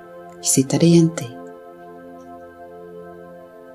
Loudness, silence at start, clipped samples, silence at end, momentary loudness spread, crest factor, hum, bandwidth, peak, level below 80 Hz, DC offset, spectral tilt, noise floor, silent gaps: -17 LUFS; 0.15 s; under 0.1%; 0.4 s; 26 LU; 20 dB; none; 15.5 kHz; -2 dBFS; -62 dBFS; under 0.1%; -5.5 dB/octave; -41 dBFS; none